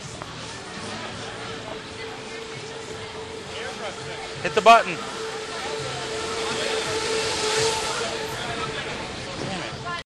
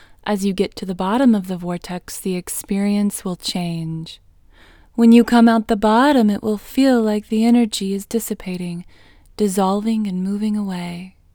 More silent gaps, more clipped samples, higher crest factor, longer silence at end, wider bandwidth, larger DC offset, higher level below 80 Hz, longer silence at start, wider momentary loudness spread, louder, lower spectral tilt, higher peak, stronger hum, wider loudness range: neither; neither; first, 24 dB vs 18 dB; second, 0.05 s vs 0.25 s; second, 13 kHz vs 19.5 kHz; neither; about the same, -52 dBFS vs -48 dBFS; second, 0 s vs 0.25 s; about the same, 13 LU vs 14 LU; second, -26 LUFS vs -18 LUFS; second, -2.5 dB/octave vs -5.5 dB/octave; about the same, -2 dBFS vs 0 dBFS; neither; first, 11 LU vs 8 LU